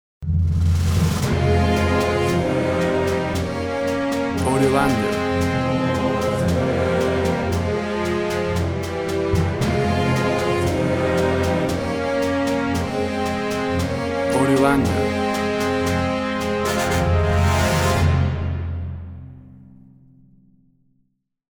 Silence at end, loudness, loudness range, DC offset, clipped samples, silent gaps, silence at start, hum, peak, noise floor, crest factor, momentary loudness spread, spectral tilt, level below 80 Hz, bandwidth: 1.95 s; -20 LUFS; 2 LU; under 0.1%; under 0.1%; none; 0.2 s; none; -4 dBFS; -67 dBFS; 16 dB; 5 LU; -6 dB/octave; -34 dBFS; over 20 kHz